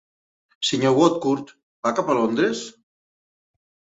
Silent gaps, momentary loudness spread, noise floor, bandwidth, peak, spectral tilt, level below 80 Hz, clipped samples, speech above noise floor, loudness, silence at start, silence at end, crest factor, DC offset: 1.63-1.83 s; 10 LU; under -90 dBFS; 8.4 kHz; -4 dBFS; -4.5 dB/octave; -66 dBFS; under 0.1%; over 70 dB; -21 LUFS; 0.6 s; 1.3 s; 20 dB; under 0.1%